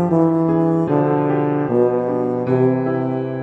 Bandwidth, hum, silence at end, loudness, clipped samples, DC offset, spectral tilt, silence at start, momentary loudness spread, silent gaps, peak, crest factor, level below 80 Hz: 4.4 kHz; none; 0 s; -18 LUFS; under 0.1%; under 0.1%; -11 dB/octave; 0 s; 4 LU; none; -4 dBFS; 14 dB; -56 dBFS